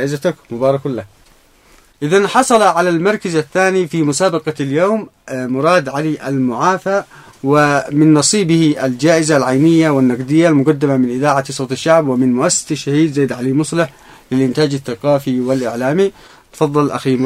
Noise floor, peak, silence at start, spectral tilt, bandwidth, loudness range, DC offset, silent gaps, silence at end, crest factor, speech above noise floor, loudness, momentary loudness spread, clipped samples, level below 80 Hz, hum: -48 dBFS; 0 dBFS; 0 s; -5 dB/octave; 15 kHz; 4 LU; under 0.1%; none; 0 s; 14 dB; 35 dB; -14 LUFS; 8 LU; under 0.1%; -54 dBFS; none